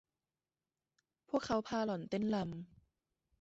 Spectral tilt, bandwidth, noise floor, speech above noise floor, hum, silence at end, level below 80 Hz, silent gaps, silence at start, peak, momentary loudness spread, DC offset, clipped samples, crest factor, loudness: -5.5 dB/octave; 8 kHz; under -90 dBFS; over 53 dB; none; 0.75 s; -70 dBFS; none; 1.3 s; -22 dBFS; 11 LU; under 0.1%; under 0.1%; 20 dB; -38 LUFS